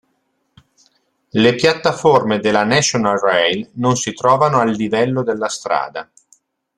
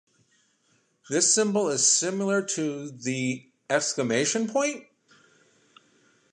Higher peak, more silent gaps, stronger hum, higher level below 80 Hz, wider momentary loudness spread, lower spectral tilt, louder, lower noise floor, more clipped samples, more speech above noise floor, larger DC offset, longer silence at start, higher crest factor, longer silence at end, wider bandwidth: first, -2 dBFS vs -8 dBFS; neither; neither; first, -56 dBFS vs -78 dBFS; second, 7 LU vs 11 LU; first, -4 dB/octave vs -2.5 dB/octave; first, -16 LUFS vs -24 LUFS; about the same, -67 dBFS vs -68 dBFS; neither; first, 51 dB vs 43 dB; neither; first, 1.35 s vs 1.05 s; about the same, 16 dB vs 20 dB; second, 0.75 s vs 1.5 s; about the same, 12 kHz vs 11.5 kHz